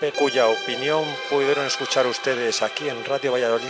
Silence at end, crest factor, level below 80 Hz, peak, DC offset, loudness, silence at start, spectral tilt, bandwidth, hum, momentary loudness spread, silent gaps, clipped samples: 0 s; 14 dB; -72 dBFS; -8 dBFS; under 0.1%; -22 LUFS; 0 s; -2.5 dB/octave; 8 kHz; none; 5 LU; none; under 0.1%